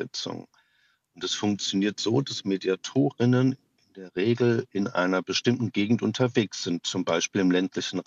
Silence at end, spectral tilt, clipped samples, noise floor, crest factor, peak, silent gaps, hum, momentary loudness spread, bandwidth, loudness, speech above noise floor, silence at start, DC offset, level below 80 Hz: 0.05 s; -5 dB/octave; under 0.1%; -68 dBFS; 18 dB; -8 dBFS; none; none; 9 LU; 8 kHz; -26 LUFS; 42 dB; 0 s; under 0.1%; -76 dBFS